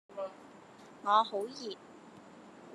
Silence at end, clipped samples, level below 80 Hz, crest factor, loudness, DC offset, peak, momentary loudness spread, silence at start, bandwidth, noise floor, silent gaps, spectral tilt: 0 s; under 0.1%; -88 dBFS; 24 dB; -34 LUFS; under 0.1%; -14 dBFS; 26 LU; 0.1 s; 12.5 kHz; -55 dBFS; none; -3.5 dB/octave